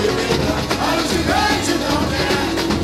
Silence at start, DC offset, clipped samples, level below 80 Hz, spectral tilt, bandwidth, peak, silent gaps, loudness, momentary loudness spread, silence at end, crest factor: 0 s; under 0.1%; under 0.1%; -32 dBFS; -4 dB/octave; 16.5 kHz; -4 dBFS; none; -18 LUFS; 3 LU; 0 s; 14 dB